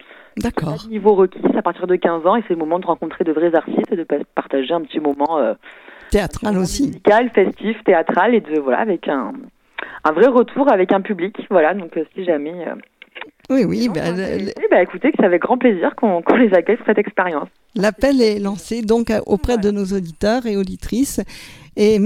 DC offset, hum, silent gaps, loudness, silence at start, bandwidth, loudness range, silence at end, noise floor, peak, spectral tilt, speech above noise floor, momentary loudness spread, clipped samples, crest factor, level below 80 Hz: under 0.1%; none; none; -17 LUFS; 0.35 s; 15.5 kHz; 4 LU; 0 s; -38 dBFS; 0 dBFS; -6 dB/octave; 21 dB; 11 LU; under 0.1%; 16 dB; -40 dBFS